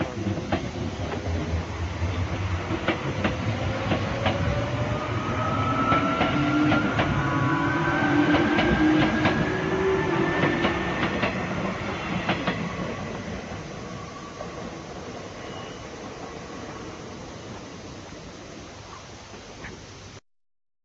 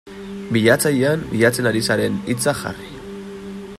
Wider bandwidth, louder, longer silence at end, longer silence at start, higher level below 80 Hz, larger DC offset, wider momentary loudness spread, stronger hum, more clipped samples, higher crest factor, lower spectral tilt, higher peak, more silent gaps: second, 7.8 kHz vs 16 kHz; second, -25 LUFS vs -18 LUFS; first, 0.65 s vs 0 s; about the same, 0 s vs 0.05 s; first, -42 dBFS vs -48 dBFS; neither; about the same, 18 LU vs 18 LU; neither; neither; about the same, 18 dB vs 18 dB; first, -6 dB/octave vs -4.5 dB/octave; second, -8 dBFS vs -2 dBFS; neither